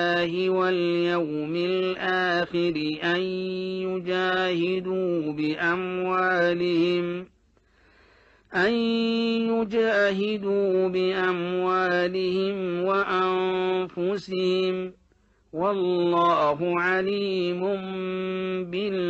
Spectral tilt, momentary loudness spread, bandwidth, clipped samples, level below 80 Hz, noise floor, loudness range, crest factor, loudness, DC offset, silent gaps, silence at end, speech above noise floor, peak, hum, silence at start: -6.5 dB/octave; 6 LU; 7.6 kHz; under 0.1%; -64 dBFS; -63 dBFS; 2 LU; 14 dB; -25 LUFS; under 0.1%; none; 0 s; 38 dB; -12 dBFS; none; 0 s